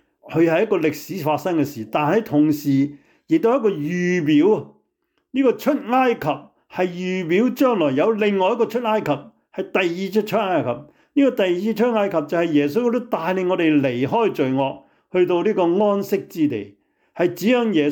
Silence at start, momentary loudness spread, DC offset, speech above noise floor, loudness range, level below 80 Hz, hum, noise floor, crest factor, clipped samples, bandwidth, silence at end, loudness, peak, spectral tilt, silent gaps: 0.25 s; 8 LU; under 0.1%; 52 dB; 2 LU; -66 dBFS; none; -71 dBFS; 12 dB; under 0.1%; 19.5 kHz; 0 s; -20 LUFS; -8 dBFS; -6.5 dB/octave; none